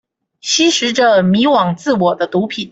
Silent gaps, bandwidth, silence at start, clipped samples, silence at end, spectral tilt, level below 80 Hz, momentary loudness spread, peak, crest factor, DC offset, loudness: none; 8.2 kHz; 0.45 s; under 0.1%; 0.05 s; -4 dB/octave; -56 dBFS; 6 LU; -2 dBFS; 12 dB; under 0.1%; -13 LUFS